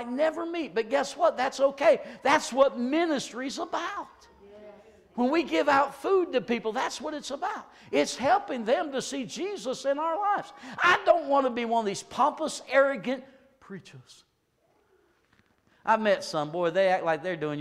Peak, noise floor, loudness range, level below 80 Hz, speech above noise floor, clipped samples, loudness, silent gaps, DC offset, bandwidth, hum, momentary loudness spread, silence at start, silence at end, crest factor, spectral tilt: -8 dBFS; -70 dBFS; 5 LU; -68 dBFS; 43 dB; under 0.1%; -27 LUFS; none; under 0.1%; 13.5 kHz; none; 11 LU; 0 s; 0 s; 20 dB; -3.5 dB/octave